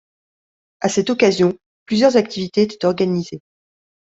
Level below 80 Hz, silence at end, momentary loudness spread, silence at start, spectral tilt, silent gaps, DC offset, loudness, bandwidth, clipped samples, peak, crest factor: -60 dBFS; 0.8 s; 11 LU; 0.8 s; -5.5 dB/octave; 1.66-1.86 s; under 0.1%; -18 LUFS; 8 kHz; under 0.1%; -2 dBFS; 18 dB